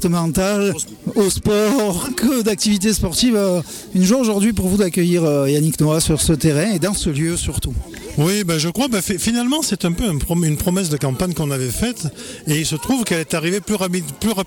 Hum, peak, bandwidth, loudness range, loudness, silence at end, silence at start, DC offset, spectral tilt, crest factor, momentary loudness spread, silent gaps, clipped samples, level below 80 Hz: none; -4 dBFS; 18.5 kHz; 3 LU; -18 LUFS; 0 s; 0 s; under 0.1%; -5 dB/octave; 14 dB; 6 LU; none; under 0.1%; -36 dBFS